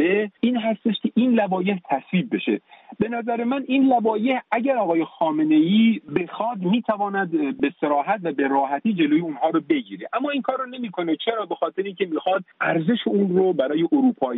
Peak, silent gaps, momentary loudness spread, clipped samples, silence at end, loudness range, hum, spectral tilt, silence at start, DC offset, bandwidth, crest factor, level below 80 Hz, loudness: -8 dBFS; none; 7 LU; under 0.1%; 0 s; 4 LU; none; -5 dB/octave; 0 s; under 0.1%; 4 kHz; 14 dB; -68 dBFS; -22 LUFS